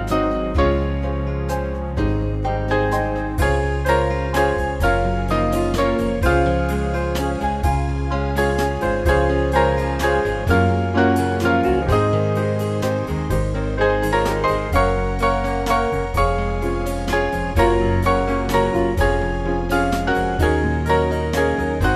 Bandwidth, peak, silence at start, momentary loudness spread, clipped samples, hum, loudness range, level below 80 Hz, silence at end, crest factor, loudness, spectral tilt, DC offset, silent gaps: 14 kHz; -2 dBFS; 0 s; 5 LU; under 0.1%; none; 2 LU; -26 dBFS; 0 s; 16 dB; -20 LUFS; -6.5 dB/octave; 0.2%; none